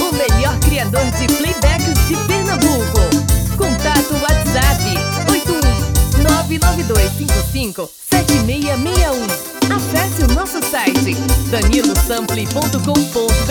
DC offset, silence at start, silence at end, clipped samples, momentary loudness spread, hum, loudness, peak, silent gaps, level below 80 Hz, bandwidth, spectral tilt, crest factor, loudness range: under 0.1%; 0 s; 0 s; under 0.1%; 4 LU; none; -15 LUFS; 0 dBFS; none; -20 dBFS; over 20 kHz; -4.5 dB/octave; 14 dB; 2 LU